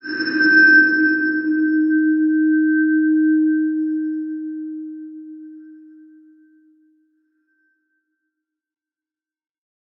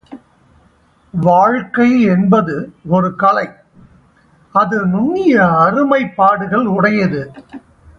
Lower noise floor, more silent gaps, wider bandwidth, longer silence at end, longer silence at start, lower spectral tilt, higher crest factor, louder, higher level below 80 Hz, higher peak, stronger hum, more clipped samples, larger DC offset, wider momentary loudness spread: first, under -90 dBFS vs -52 dBFS; neither; second, 5.8 kHz vs 6.6 kHz; first, 4.25 s vs 0.4 s; about the same, 0.05 s vs 0.1 s; second, -6 dB/octave vs -8.5 dB/octave; about the same, 16 dB vs 14 dB; second, -16 LUFS vs -13 LUFS; second, -80 dBFS vs -50 dBFS; about the same, -2 dBFS vs 0 dBFS; neither; neither; neither; first, 22 LU vs 9 LU